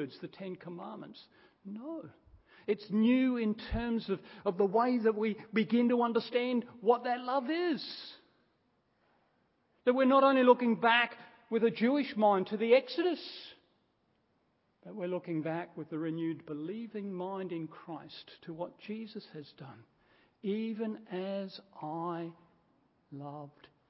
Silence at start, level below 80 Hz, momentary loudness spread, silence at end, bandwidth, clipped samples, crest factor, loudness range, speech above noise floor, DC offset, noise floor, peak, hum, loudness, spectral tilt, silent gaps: 0 s; -60 dBFS; 20 LU; 0.4 s; 5.8 kHz; under 0.1%; 22 dB; 13 LU; 43 dB; under 0.1%; -75 dBFS; -10 dBFS; none; -32 LUFS; -9.5 dB/octave; none